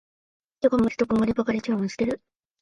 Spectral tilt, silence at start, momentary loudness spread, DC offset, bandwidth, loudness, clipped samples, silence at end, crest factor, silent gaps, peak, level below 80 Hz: -7 dB/octave; 0.6 s; 6 LU; under 0.1%; 10.5 kHz; -24 LUFS; under 0.1%; 0.45 s; 18 dB; none; -8 dBFS; -52 dBFS